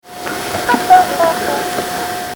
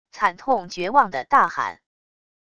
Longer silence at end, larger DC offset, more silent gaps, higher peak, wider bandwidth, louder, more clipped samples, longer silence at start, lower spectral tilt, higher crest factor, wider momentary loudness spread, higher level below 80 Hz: second, 0 s vs 0.8 s; neither; neither; about the same, 0 dBFS vs -2 dBFS; first, over 20 kHz vs 11 kHz; first, -14 LUFS vs -21 LUFS; first, 0.2% vs under 0.1%; about the same, 0.05 s vs 0.15 s; about the same, -3 dB/octave vs -4 dB/octave; second, 14 dB vs 20 dB; first, 11 LU vs 7 LU; first, -46 dBFS vs -62 dBFS